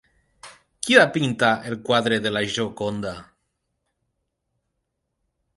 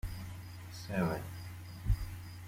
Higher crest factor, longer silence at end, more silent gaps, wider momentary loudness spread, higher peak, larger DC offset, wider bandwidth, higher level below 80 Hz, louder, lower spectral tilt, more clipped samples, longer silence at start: about the same, 24 dB vs 20 dB; first, 2.35 s vs 0 s; neither; first, 16 LU vs 12 LU; first, 0 dBFS vs -18 dBFS; neither; second, 11.5 kHz vs 16.5 kHz; second, -60 dBFS vs -44 dBFS; first, -21 LUFS vs -40 LUFS; second, -4 dB/octave vs -6.5 dB/octave; neither; first, 0.45 s vs 0.05 s